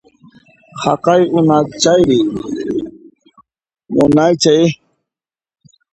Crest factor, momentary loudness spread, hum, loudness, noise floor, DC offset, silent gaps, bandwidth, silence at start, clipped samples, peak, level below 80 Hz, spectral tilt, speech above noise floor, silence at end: 14 dB; 12 LU; none; -13 LUFS; -88 dBFS; under 0.1%; none; 9.8 kHz; 0.75 s; under 0.1%; 0 dBFS; -48 dBFS; -5.5 dB/octave; 76 dB; 1.2 s